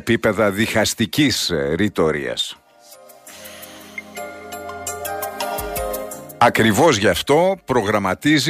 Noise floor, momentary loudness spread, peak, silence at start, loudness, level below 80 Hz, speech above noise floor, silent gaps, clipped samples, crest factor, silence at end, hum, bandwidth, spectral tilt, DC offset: -46 dBFS; 18 LU; -2 dBFS; 0.05 s; -18 LUFS; -44 dBFS; 29 dB; none; under 0.1%; 16 dB; 0 s; none; 15.5 kHz; -4 dB/octave; under 0.1%